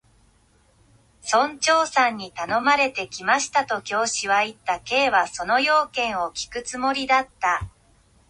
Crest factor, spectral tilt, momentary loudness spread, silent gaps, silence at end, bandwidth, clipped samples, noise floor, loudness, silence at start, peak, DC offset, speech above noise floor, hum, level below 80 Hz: 18 dB; -2 dB/octave; 9 LU; none; 0.6 s; 11.5 kHz; under 0.1%; -60 dBFS; -22 LUFS; 1.25 s; -6 dBFS; under 0.1%; 37 dB; none; -54 dBFS